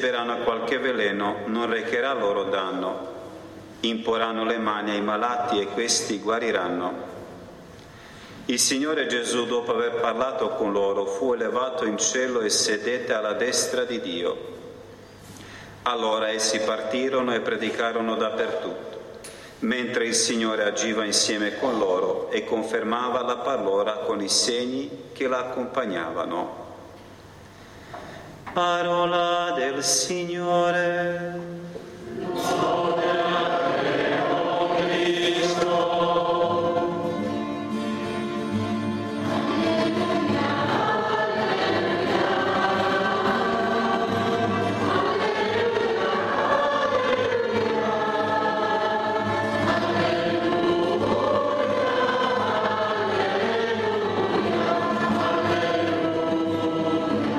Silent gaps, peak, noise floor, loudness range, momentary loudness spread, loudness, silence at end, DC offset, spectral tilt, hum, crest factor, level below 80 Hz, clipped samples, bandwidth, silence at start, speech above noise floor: none; -6 dBFS; -45 dBFS; 4 LU; 9 LU; -24 LUFS; 0 s; under 0.1%; -3.5 dB/octave; none; 18 dB; -60 dBFS; under 0.1%; 14.5 kHz; 0 s; 21 dB